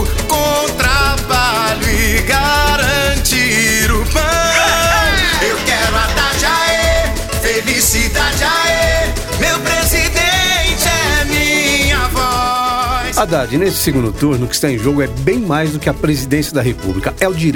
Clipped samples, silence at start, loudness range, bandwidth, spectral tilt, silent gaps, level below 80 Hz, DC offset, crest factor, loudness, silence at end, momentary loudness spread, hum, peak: under 0.1%; 0 s; 3 LU; 18 kHz; -3.5 dB/octave; none; -22 dBFS; 0.5%; 14 dB; -13 LUFS; 0 s; 5 LU; none; 0 dBFS